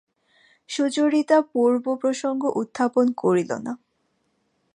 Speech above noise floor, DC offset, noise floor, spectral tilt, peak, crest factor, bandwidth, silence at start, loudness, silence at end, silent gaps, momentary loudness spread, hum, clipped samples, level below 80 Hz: 49 dB; under 0.1%; -71 dBFS; -5 dB/octave; -6 dBFS; 16 dB; 10.5 kHz; 0.7 s; -22 LUFS; 1 s; none; 11 LU; none; under 0.1%; -74 dBFS